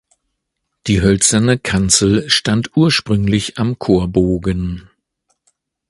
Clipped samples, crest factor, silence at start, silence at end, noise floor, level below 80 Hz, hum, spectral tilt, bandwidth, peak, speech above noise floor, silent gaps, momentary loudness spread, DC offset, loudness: under 0.1%; 16 dB; 0.85 s; 1.1 s; -74 dBFS; -34 dBFS; none; -4 dB/octave; 11.5 kHz; 0 dBFS; 60 dB; none; 9 LU; under 0.1%; -15 LUFS